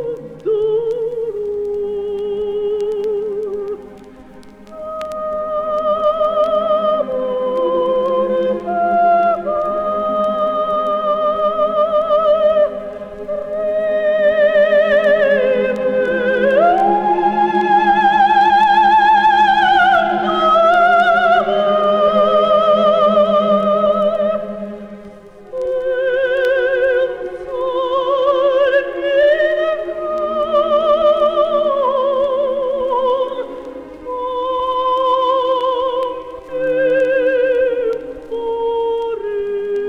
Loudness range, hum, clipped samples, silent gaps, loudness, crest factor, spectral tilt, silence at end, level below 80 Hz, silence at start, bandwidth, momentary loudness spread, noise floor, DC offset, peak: 8 LU; none; under 0.1%; none; -15 LUFS; 12 dB; -5.5 dB/octave; 0 s; -50 dBFS; 0 s; 7.8 kHz; 11 LU; -38 dBFS; under 0.1%; -2 dBFS